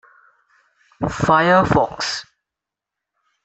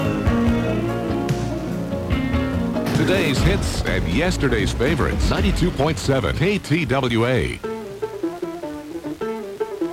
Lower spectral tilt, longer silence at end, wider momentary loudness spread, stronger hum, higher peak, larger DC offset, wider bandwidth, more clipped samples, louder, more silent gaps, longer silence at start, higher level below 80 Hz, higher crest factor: about the same, -5 dB/octave vs -6 dB/octave; first, 1.25 s vs 0 s; first, 13 LU vs 10 LU; neither; first, -2 dBFS vs -6 dBFS; neither; second, 8.4 kHz vs 16.5 kHz; neither; first, -17 LUFS vs -21 LUFS; neither; first, 1 s vs 0 s; second, -46 dBFS vs -30 dBFS; about the same, 18 dB vs 14 dB